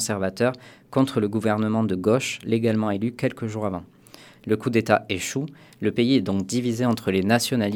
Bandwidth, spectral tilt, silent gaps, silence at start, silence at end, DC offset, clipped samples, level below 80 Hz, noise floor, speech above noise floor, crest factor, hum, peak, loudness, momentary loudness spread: 18 kHz; -5.5 dB/octave; none; 0 s; 0 s; under 0.1%; under 0.1%; -62 dBFS; -49 dBFS; 26 dB; 22 dB; none; -2 dBFS; -24 LUFS; 8 LU